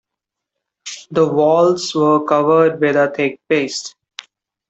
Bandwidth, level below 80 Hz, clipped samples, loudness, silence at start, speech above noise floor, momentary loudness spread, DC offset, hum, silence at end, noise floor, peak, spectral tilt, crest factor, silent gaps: 8.2 kHz; -64 dBFS; under 0.1%; -15 LUFS; 0.85 s; 67 dB; 19 LU; under 0.1%; none; 0.8 s; -82 dBFS; -2 dBFS; -5 dB/octave; 14 dB; none